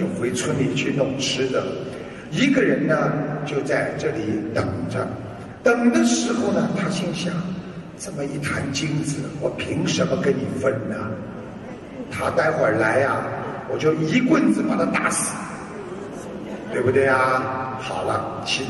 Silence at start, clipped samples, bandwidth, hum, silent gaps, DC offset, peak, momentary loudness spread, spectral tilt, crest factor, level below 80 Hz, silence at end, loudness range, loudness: 0 s; under 0.1%; 12.5 kHz; none; none; under 0.1%; -4 dBFS; 15 LU; -5 dB/octave; 18 dB; -52 dBFS; 0 s; 4 LU; -22 LUFS